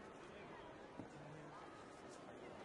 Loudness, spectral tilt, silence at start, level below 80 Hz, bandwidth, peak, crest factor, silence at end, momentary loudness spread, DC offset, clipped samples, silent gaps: -56 LUFS; -5 dB/octave; 0 s; -78 dBFS; 11 kHz; -38 dBFS; 18 dB; 0 s; 1 LU; under 0.1%; under 0.1%; none